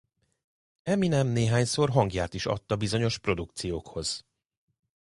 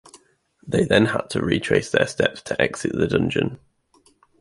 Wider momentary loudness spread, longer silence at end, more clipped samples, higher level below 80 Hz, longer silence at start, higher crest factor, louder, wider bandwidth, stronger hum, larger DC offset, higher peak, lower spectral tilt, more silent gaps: first, 9 LU vs 6 LU; about the same, 0.9 s vs 0.85 s; neither; about the same, -50 dBFS vs -48 dBFS; first, 0.85 s vs 0.15 s; about the same, 22 dB vs 20 dB; second, -28 LUFS vs -21 LUFS; about the same, 11.5 kHz vs 11.5 kHz; neither; neither; second, -8 dBFS vs -2 dBFS; about the same, -5.5 dB/octave vs -5.5 dB/octave; neither